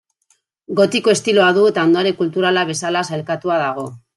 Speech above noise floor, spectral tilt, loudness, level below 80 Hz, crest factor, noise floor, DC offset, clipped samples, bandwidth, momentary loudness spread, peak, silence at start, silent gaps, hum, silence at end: 47 dB; -4.5 dB/octave; -16 LUFS; -66 dBFS; 16 dB; -63 dBFS; under 0.1%; under 0.1%; 12 kHz; 9 LU; -2 dBFS; 0.7 s; none; none; 0.2 s